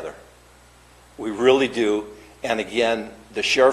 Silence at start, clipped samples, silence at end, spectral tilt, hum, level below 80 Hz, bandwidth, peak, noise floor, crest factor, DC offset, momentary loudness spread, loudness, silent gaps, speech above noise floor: 0 s; under 0.1%; 0 s; -3.5 dB/octave; none; -54 dBFS; 13 kHz; -4 dBFS; -51 dBFS; 20 dB; under 0.1%; 15 LU; -22 LUFS; none; 30 dB